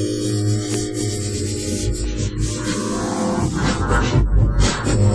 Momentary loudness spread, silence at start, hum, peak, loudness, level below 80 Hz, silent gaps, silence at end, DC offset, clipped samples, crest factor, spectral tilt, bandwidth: 5 LU; 0 s; none; -4 dBFS; -20 LUFS; -24 dBFS; none; 0 s; under 0.1%; under 0.1%; 14 dB; -5 dB/octave; 11 kHz